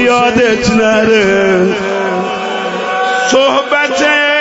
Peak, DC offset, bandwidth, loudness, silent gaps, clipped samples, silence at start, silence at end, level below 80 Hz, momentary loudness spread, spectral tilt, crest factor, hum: 0 dBFS; under 0.1%; 8 kHz; -11 LUFS; none; under 0.1%; 0 s; 0 s; -40 dBFS; 7 LU; -4 dB/octave; 10 dB; none